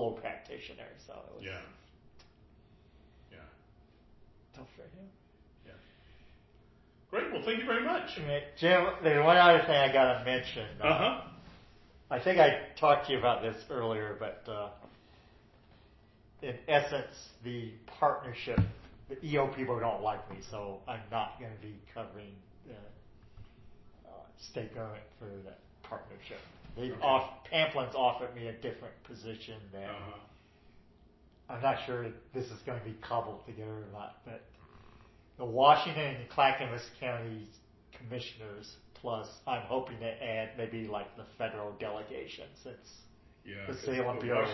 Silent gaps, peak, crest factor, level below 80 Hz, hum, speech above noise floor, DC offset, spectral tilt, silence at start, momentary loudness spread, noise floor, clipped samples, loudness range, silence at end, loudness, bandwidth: none; -8 dBFS; 26 dB; -58 dBFS; none; 29 dB; under 0.1%; -3 dB/octave; 0 s; 23 LU; -62 dBFS; under 0.1%; 20 LU; 0 s; -32 LUFS; 6 kHz